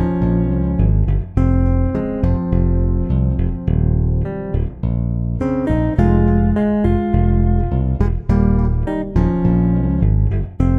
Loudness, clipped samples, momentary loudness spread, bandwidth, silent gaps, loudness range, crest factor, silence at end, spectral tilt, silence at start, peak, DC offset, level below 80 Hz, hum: -17 LUFS; under 0.1%; 5 LU; 3.7 kHz; none; 2 LU; 14 dB; 0 s; -11 dB/octave; 0 s; -2 dBFS; under 0.1%; -20 dBFS; none